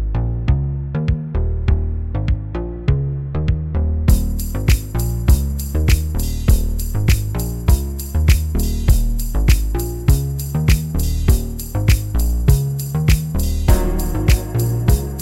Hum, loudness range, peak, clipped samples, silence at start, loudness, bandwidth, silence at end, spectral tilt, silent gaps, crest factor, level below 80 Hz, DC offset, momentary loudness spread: none; 2 LU; -2 dBFS; under 0.1%; 0 s; -19 LUFS; 16.5 kHz; 0 s; -6 dB/octave; none; 14 dB; -18 dBFS; under 0.1%; 5 LU